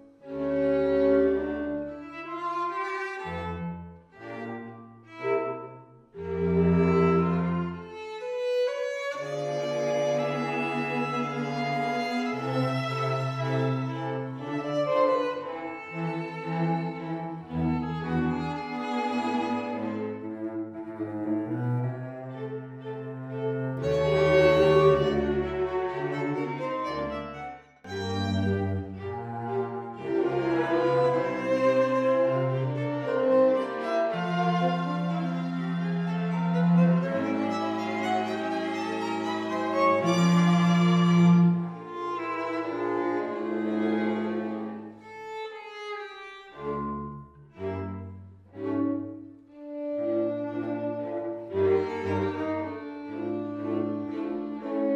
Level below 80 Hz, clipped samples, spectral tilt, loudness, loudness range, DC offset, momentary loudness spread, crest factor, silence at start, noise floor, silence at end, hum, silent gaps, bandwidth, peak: -54 dBFS; under 0.1%; -7.5 dB/octave; -28 LUFS; 9 LU; under 0.1%; 15 LU; 18 dB; 0 s; -48 dBFS; 0 s; none; none; 8.2 kHz; -10 dBFS